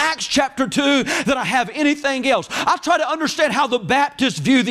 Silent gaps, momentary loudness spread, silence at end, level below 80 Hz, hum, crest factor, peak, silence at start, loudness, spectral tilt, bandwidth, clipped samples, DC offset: none; 3 LU; 0 s; -52 dBFS; none; 12 dB; -6 dBFS; 0 s; -18 LUFS; -3.5 dB/octave; 15.5 kHz; under 0.1%; under 0.1%